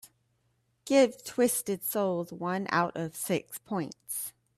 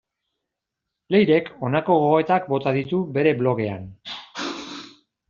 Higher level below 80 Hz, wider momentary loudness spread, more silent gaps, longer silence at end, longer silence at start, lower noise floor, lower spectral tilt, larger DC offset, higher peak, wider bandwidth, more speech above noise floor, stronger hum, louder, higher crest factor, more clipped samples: second, -74 dBFS vs -62 dBFS; second, 11 LU vs 17 LU; neither; second, 0.25 s vs 0.4 s; second, 0.05 s vs 1.1 s; second, -74 dBFS vs -83 dBFS; about the same, -4.5 dB/octave vs -5 dB/octave; neither; second, -10 dBFS vs -4 dBFS; first, 16 kHz vs 7.4 kHz; second, 44 dB vs 63 dB; neither; second, -30 LUFS vs -21 LUFS; about the same, 20 dB vs 18 dB; neither